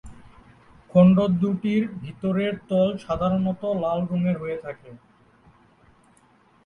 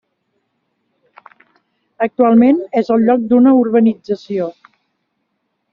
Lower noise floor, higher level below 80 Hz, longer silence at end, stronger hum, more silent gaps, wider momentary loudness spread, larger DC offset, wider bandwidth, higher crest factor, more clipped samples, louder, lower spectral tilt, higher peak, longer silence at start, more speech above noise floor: second, -58 dBFS vs -70 dBFS; first, -52 dBFS vs -60 dBFS; first, 1.7 s vs 1.2 s; neither; neither; about the same, 14 LU vs 12 LU; neither; about the same, 5.2 kHz vs 5.6 kHz; about the same, 18 dB vs 14 dB; neither; second, -23 LUFS vs -13 LUFS; first, -9.5 dB/octave vs -7 dB/octave; second, -6 dBFS vs -2 dBFS; second, 0.05 s vs 2 s; second, 36 dB vs 57 dB